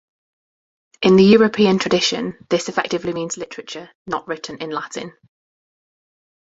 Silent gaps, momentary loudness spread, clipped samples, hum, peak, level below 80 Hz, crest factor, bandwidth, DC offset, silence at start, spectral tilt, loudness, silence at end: 3.95-4.05 s; 19 LU; under 0.1%; none; -2 dBFS; -56 dBFS; 18 dB; 8 kHz; under 0.1%; 1 s; -5 dB/octave; -18 LUFS; 1.35 s